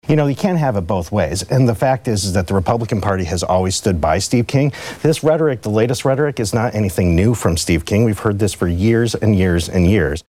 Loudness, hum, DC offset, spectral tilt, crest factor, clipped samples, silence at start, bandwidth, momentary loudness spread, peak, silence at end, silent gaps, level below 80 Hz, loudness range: -17 LUFS; none; under 0.1%; -6 dB/octave; 12 dB; under 0.1%; 0.05 s; 16 kHz; 4 LU; -4 dBFS; 0.1 s; none; -34 dBFS; 1 LU